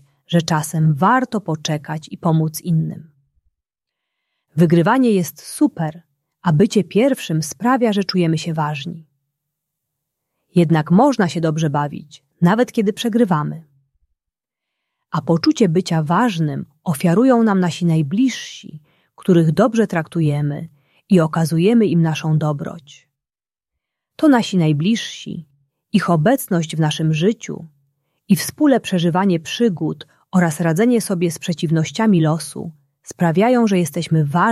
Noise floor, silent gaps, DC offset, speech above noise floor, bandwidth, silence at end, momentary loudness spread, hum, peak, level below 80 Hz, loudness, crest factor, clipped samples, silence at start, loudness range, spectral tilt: under -90 dBFS; none; under 0.1%; over 73 dB; 14.5 kHz; 0 s; 13 LU; none; -2 dBFS; -60 dBFS; -17 LUFS; 16 dB; under 0.1%; 0.3 s; 4 LU; -6.5 dB/octave